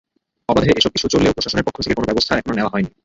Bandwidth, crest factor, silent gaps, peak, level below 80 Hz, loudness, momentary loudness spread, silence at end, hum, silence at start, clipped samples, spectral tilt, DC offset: 8 kHz; 16 dB; none; -2 dBFS; -38 dBFS; -17 LUFS; 5 LU; 0.15 s; none; 0.5 s; under 0.1%; -4.5 dB/octave; under 0.1%